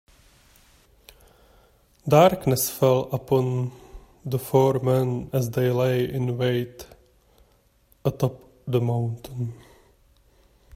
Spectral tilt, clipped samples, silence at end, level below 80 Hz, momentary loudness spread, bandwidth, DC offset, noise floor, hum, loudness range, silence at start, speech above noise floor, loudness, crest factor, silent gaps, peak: -6.5 dB/octave; under 0.1%; 1.2 s; -54 dBFS; 14 LU; 16 kHz; under 0.1%; -61 dBFS; none; 8 LU; 2.05 s; 39 dB; -23 LUFS; 20 dB; none; -4 dBFS